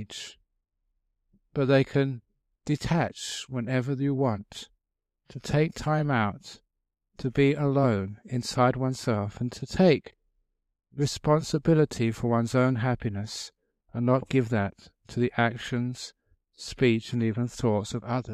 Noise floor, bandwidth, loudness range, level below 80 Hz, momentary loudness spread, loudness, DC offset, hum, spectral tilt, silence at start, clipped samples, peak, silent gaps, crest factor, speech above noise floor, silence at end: -84 dBFS; 13.5 kHz; 3 LU; -54 dBFS; 16 LU; -27 LUFS; under 0.1%; none; -6.5 dB/octave; 0 s; under 0.1%; -8 dBFS; none; 18 dB; 58 dB; 0 s